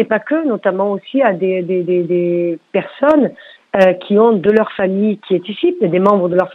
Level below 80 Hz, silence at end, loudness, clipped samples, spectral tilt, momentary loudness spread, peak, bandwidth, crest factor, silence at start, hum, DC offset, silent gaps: -58 dBFS; 0 s; -15 LUFS; under 0.1%; -8.5 dB/octave; 7 LU; 0 dBFS; 6.2 kHz; 14 dB; 0 s; none; under 0.1%; none